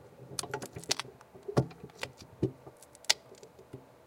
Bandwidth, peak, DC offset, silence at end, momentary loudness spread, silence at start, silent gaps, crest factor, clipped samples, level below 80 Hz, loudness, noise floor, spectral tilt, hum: 16.5 kHz; -2 dBFS; under 0.1%; 0.2 s; 22 LU; 0 s; none; 36 dB; under 0.1%; -62 dBFS; -35 LUFS; -54 dBFS; -3.5 dB/octave; none